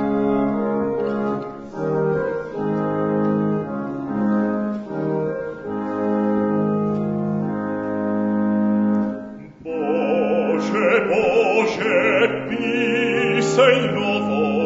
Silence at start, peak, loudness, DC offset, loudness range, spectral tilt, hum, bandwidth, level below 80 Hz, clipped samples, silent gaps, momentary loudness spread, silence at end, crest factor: 0 s; -4 dBFS; -20 LUFS; under 0.1%; 5 LU; -6.5 dB/octave; none; 7.8 kHz; -56 dBFS; under 0.1%; none; 9 LU; 0 s; 16 dB